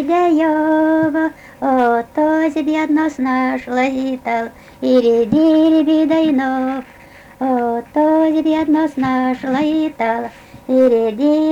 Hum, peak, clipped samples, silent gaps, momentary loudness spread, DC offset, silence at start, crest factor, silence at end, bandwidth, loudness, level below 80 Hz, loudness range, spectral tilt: none; -4 dBFS; under 0.1%; none; 8 LU; under 0.1%; 0 s; 10 dB; 0 s; 7.8 kHz; -16 LUFS; -52 dBFS; 2 LU; -6.5 dB/octave